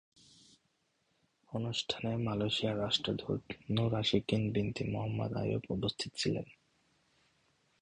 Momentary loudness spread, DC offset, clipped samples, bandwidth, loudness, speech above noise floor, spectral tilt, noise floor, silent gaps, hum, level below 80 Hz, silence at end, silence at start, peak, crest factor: 7 LU; under 0.1%; under 0.1%; 10.5 kHz; -35 LUFS; 43 dB; -5.5 dB/octave; -78 dBFS; none; none; -60 dBFS; 1.3 s; 1.5 s; -14 dBFS; 22 dB